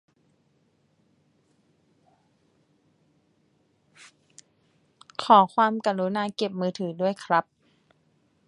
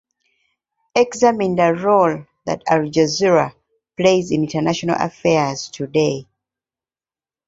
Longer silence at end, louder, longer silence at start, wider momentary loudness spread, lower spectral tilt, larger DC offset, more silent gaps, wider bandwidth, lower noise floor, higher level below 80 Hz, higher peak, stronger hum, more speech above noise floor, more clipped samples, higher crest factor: second, 1.05 s vs 1.25 s; second, -24 LUFS vs -18 LUFS; first, 5.2 s vs 0.95 s; about the same, 11 LU vs 10 LU; about the same, -5.5 dB/octave vs -5 dB/octave; neither; neither; first, 11 kHz vs 7.8 kHz; second, -68 dBFS vs under -90 dBFS; second, -78 dBFS vs -56 dBFS; about the same, -4 dBFS vs -2 dBFS; neither; second, 45 dB vs over 73 dB; neither; first, 26 dB vs 18 dB